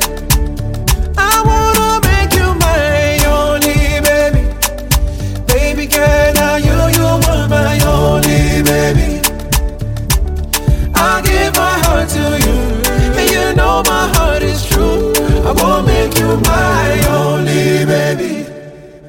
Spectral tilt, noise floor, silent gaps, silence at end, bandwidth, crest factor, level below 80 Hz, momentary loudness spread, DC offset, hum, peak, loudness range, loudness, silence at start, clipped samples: -4.5 dB/octave; -33 dBFS; none; 0 s; 17 kHz; 12 dB; -18 dBFS; 5 LU; under 0.1%; none; 0 dBFS; 2 LU; -12 LUFS; 0 s; under 0.1%